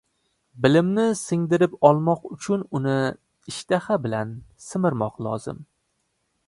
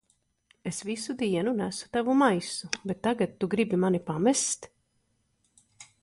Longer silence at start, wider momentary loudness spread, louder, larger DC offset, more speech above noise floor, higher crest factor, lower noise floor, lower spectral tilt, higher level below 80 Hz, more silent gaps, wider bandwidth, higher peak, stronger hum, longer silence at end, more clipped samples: about the same, 0.55 s vs 0.65 s; first, 17 LU vs 10 LU; first, -23 LUFS vs -28 LUFS; neither; first, 51 dB vs 45 dB; about the same, 22 dB vs 20 dB; about the same, -73 dBFS vs -73 dBFS; first, -6.5 dB/octave vs -4.5 dB/octave; first, -60 dBFS vs -66 dBFS; neither; about the same, 11.5 kHz vs 11.5 kHz; first, -2 dBFS vs -8 dBFS; neither; first, 0.85 s vs 0.2 s; neither